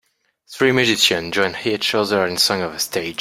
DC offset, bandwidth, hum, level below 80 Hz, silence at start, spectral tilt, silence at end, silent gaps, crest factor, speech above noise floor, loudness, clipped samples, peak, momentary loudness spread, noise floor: under 0.1%; 16.5 kHz; none; -58 dBFS; 0.5 s; -3 dB/octave; 0.05 s; none; 18 dB; 34 dB; -18 LUFS; under 0.1%; 0 dBFS; 7 LU; -53 dBFS